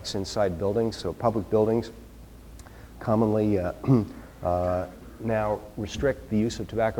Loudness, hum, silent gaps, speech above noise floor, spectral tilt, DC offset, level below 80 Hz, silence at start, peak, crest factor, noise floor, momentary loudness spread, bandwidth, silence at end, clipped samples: -27 LUFS; none; none; 20 dB; -7 dB/octave; under 0.1%; -46 dBFS; 0 s; -8 dBFS; 18 dB; -46 dBFS; 15 LU; 19 kHz; 0 s; under 0.1%